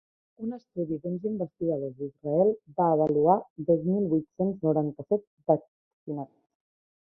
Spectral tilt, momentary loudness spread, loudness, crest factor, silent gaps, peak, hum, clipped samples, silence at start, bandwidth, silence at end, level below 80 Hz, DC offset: -13.5 dB/octave; 14 LU; -28 LUFS; 20 dB; 3.50-3.56 s, 5.27-5.37 s, 5.68-6.07 s; -8 dBFS; none; under 0.1%; 0.4 s; 2.2 kHz; 0.75 s; -68 dBFS; under 0.1%